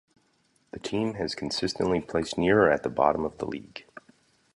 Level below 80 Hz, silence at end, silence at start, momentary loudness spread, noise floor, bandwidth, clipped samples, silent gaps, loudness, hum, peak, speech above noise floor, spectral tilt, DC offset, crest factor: -54 dBFS; 0.55 s; 0.75 s; 17 LU; -68 dBFS; 11.5 kHz; under 0.1%; none; -27 LUFS; none; -6 dBFS; 42 dB; -5 dB/octave; under 0.1%; 22 dB